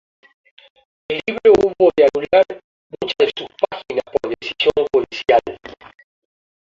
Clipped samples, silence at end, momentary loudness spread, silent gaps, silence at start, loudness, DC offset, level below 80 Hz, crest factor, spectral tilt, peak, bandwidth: under 0.1%; 0.95 s; 14 LU; 2.64-2.90 s; 1.1 s; -17 LUFS; under 0.1%; -52 dBFS; 18 dB; -5 dB/octave; -2 dBFS; 7.4 kHz